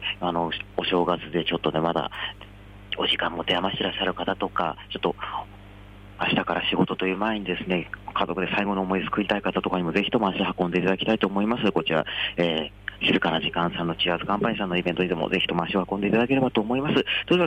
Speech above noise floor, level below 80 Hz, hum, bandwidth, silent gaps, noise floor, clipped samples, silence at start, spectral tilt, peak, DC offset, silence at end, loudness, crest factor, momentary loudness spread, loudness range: 20 dB; -50 dBFS; 50 Hz at -45 dBFS; 9.6 kHz; none; -45 dBFS; under 0.1%; 0 s; -7 dB/octave; -10 dBFS; under 0.1%; 0 s; -25 LUFS; 16 dB; 6 LU; 3 LU